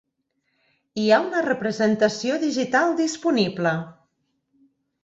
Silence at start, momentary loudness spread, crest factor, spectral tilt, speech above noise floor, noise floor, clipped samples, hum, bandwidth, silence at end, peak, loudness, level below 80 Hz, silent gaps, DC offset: 0.95 s; 6 LU; 18 dB; -5 dB/octave; 53 dB; -74 dBFS; under 0.1%; none; 8 kHz; 1.1 s; -6 dBFS; -22 LUFS; -66 dBFS; none; under 0.1%